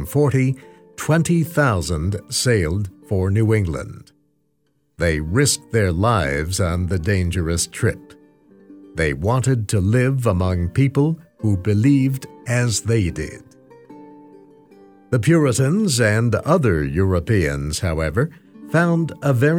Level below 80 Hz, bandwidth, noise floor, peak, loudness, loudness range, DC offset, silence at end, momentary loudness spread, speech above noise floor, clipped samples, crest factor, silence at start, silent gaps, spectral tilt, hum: -38 dBFS; 19 kHz; -67 dBFS; -4 dBFS; -19 LUFS; 4 LU; under 0.1%; 0 s; 7 LU; 49 dB; under 0.1%; 16 dB; 0 s; none; -5.5 dB/octave; none